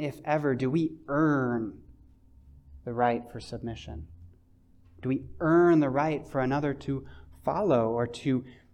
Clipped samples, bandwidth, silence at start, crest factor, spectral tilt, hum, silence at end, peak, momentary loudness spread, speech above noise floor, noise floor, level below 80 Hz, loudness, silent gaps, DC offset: under 0.1%; 9.4 kHz; 0 s; 16 dB; -8 dB/octave; none; 0.2 s; -12 dBFS; 15 LU; 31 dB; -59 dBFS; -54 dBFS; -28 LUFS; none; under 0.1%